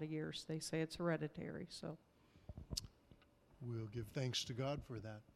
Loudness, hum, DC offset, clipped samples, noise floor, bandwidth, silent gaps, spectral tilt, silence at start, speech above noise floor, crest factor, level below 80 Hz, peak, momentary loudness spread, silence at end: -45 LUFS; none; under 0.1%; under 0.1%; -69 dBFS; 15 kHz; none; -5 dB/octave; 0 s; 24 dB; 26 dB; -64 dBFS; -22 dBFS; 15 LU; 0.05 s